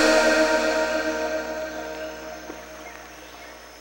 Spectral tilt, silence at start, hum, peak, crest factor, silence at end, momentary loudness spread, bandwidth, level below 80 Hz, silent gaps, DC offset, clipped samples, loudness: -2 dB/octave; 0 s; 60 Hz at -50 dBFS; -6 dBFS; 18 dB; 0 s; 22 LU; 16.5 kHz; -50 dBFS; none; under 0.1%; under 0.1%; -23 LUFS